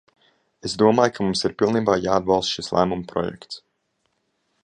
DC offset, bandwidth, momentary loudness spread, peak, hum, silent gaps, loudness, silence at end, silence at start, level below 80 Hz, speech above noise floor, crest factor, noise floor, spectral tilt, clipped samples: under 0.1%; 10 kHz; 15 LU; -2 dBFS; none; none; -21 LUFS; 1.05 s; 0.65 s; -52 dBFS; 51 dB; 22 dB; -72 dBFS; -5 dB/octave; under 0.1%